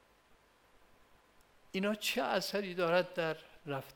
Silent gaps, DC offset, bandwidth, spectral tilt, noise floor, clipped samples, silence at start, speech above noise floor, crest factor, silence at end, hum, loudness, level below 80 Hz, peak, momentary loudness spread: none; under 0.1%; over 20 kHz; -4 dB/octave; -67 dBFS; under 0.1%; 1.75 s; 32 dB; 22 dB; 0.05 s; none; -35 LUFS; -74 dBFS; -16 dBFS; 11 LU